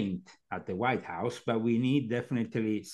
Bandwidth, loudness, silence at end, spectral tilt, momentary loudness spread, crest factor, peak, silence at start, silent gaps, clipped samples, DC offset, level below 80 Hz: 12.5 kHz; -32 LUFS; 0 s; -7 dB/octave; 11 LU; 18 dB; -14 dBFS; 0 s; none; under 0.1%; under 0.1%; -70 dBFS